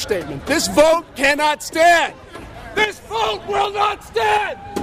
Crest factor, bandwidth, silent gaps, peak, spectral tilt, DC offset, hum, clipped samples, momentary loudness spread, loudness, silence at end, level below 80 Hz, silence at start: 18 dB; 15.5 kHz; none; 0 dBFS; -2.5 dB/octave; under 0.1%; none; under 0.1%; 11 LU; -17 LUFS; 0 s; -44 dBFS; 0 s